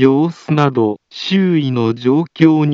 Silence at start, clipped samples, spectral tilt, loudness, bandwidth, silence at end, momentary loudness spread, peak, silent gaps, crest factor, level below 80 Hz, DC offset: 0 s; under 0.1%; -8 dB/octave; -15 LUFS; 7.2 kHz; 0 s; 5 LU; 0 dBFS; none; 14 dB; -64 dBFS; under 0.1%